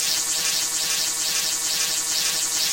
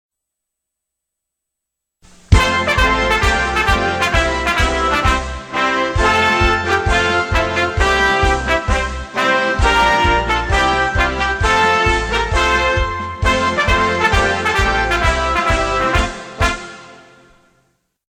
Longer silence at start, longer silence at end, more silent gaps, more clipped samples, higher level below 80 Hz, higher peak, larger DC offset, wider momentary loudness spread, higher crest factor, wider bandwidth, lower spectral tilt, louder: second, 0 s vs 2.3 s; second, 0 s vs 1.15 s; neither; neither; second, -58 dBFS vs -24 dBFS; second, -8 dBFS vs 0 dBFS; first, 0.1% vs under 0.1%; second, 1 LU vs 6 LU; about the same, 16 dB vs 16 dB; about the same, 17 kHz vs 16.5 kHz; second, 2 dB/octave vs -4 dB/octave; second, -20 LUFS vs -15 LUFS